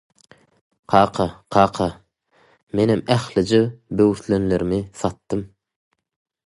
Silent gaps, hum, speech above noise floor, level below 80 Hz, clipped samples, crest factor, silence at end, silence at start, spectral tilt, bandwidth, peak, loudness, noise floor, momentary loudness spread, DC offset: 2.63-2.67 s; none; 40 dB; -46 dBFS; under 0.1%; 22 dB; 1 s; 0.9 s; -6.5 dB/octave; 11.5 kHz; 0 dBFS; -20 LUFS; -59 dBFS; 10 LU; under 0.1%